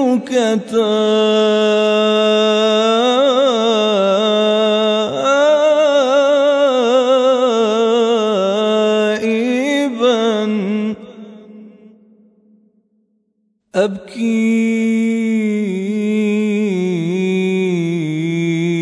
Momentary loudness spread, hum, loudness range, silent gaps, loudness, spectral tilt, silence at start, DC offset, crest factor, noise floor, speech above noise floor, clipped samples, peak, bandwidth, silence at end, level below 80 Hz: 6 LU; none; 8 LU; none; -15 LUFS; -5.5 dB/octave; 0 s; under 0.1%; 12 dB; -65 dBFS; 51 dB; under 0.1%; -4 dBFS; 11 kHz; 0 s; -68 dBFS